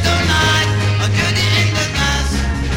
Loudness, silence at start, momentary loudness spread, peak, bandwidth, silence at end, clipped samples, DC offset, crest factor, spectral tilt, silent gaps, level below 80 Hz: -15 LUFS; 0 s; 4 LU; 0 dBFS; 16.5 kHz; 0 s; under 0.1%; under 0.1%; 14 dB; -4 dB/octave; none; -24 dBFS